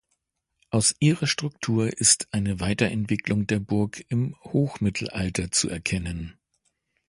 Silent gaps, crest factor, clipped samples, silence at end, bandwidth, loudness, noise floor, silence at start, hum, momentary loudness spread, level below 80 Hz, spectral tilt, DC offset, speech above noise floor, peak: none; 22 dB; under 0.1%; 0.75 s; 11.5 kHz; -24 LUFS; -76 dBFS; 0.7 s; none; 8 LU; -46 dBFS; -4 dB/octave; under 0.1%; 52 dB; -4 dBFS